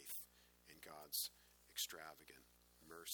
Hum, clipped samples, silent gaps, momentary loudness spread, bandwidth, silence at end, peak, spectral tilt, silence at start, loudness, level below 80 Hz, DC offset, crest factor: 60 Hz at -80 dBFS; under 0.1%; none; 23 LU; over 20 kHz; 0 s; -30 dBFS; 0.5 dB/octave; 0 s; -48 LUFS; -80 dBFS; under 0.1%; 22 dB